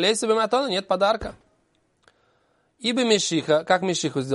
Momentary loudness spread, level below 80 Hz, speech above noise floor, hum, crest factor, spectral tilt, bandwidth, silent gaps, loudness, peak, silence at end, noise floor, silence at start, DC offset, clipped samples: 6 LU; -56 dBFS; 45 dB; none; 18 dB; -3.5 dB/octave; 11.5 kHz; none; -22 LUFS; -4 dBFS; 0 s; -67 dBFS; 0 s; under 0.1%; under 0.1%